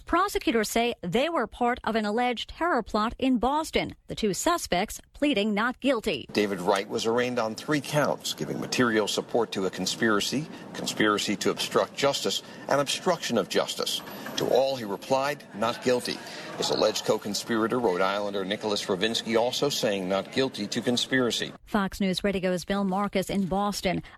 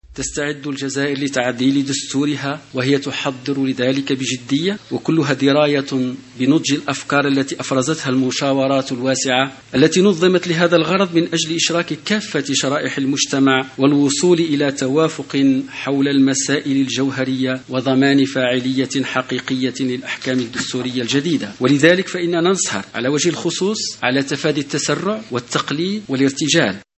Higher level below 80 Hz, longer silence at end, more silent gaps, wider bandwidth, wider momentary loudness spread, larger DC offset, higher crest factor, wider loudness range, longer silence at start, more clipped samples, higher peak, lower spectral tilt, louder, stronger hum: about the same, -52 dBFS vs -56 dBFS; second, 0 s vs 0.15 s; neither; first, 14 kHz vs 8.6 kHz; about the same, 5 LU vs 7 LU; neither; about the same, 16 dB vs 18 dB; second, 1 LU vs 4 LU; about the same, 0 s vs 0.1 s; neither; second, -10 dBFS vs 0 dBFS; about the same, -4 dB/octave vs -4 dB/octave; second, -27 LUFS vs -18 LUFS; neither